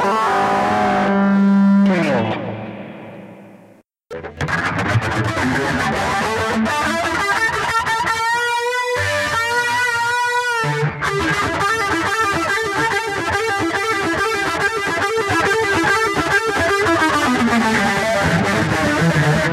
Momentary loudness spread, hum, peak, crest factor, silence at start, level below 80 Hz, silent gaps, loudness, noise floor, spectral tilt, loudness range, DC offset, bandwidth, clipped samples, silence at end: 5 LU; none; -4 dBFS; 14 dB; 0 s; -44 dBFS; none; -17 LUFS; -49 dBFS; -4.5 dB/octave; 5 LU; under 0.1%; 15.5 kHz; under 0.1%; 0 s